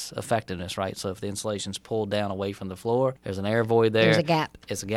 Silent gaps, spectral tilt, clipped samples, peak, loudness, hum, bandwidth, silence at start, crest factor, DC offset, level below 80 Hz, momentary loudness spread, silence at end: none; -5 dB/octave; under 0.1%; -6 dBFS; -26 LUFS; none; 16 kHz; 0 s; 20 dB; under 0.1%; -60 dBFS; 12 LU; 0 s